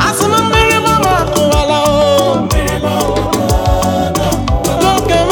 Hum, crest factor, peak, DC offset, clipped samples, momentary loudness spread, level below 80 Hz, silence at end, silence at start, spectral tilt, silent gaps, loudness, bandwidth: none; 12 dB; 0 dBFS; under 0.1%; under 0.1%; 5 LU; -22 dBFS; 0 s; 0 s; -4.5 dB/octave; none; -12 LUFS; 19 kHz